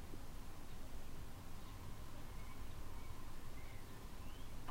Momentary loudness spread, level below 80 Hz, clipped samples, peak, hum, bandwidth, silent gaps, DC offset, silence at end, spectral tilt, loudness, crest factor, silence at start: 1 LU; -50 dBFS; under 0.1%; -34 dBFS; none; 16 kHz; none; under 0.1%; 0 s; -5 dB/octave; -55 LUFS; 12 dB; 0 s